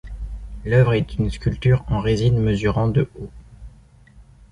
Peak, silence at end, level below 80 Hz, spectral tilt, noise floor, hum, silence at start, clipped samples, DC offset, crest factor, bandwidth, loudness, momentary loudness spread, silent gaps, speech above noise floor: -4 dBFS; 0.3 s; -34 dBFS; -8 dB/octave; -48 dBFS; none; 0.05 s; under 0.1%; under 0.1%; 18 dB; 10 kHz; -20 LUFS; 17 LU; none; 30 dB